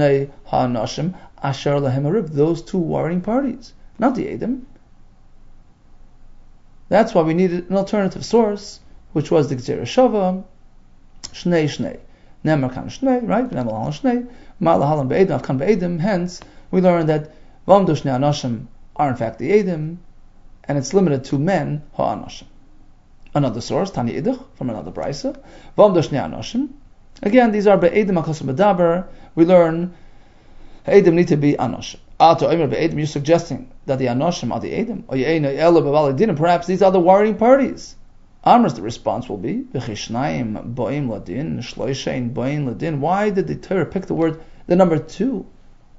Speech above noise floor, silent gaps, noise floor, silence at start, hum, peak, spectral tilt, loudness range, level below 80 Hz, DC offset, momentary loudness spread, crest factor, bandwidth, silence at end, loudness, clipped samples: 27 dB; none; -45 dBFS; 0 s; none; 0 dBFS; -7 dB/octave; 7 LU; -44 dBFS; under 0.1%; 13 LU; 18 dB; 7.8 kHz; 0.55 s; -19 LUFS; under 0.1%